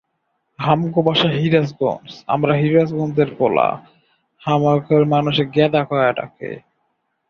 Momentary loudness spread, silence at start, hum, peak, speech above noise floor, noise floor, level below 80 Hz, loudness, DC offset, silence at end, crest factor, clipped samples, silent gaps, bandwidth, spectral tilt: 14 LU; 0.6 s; none; -2 dBFS; 54 dB; -71 dBFS; -56 dBFS; -17 LUFS; under 0.1%; 0.7 s; 16 dB; under 0.1%; none; 6.8 kHz; -8 dB/octave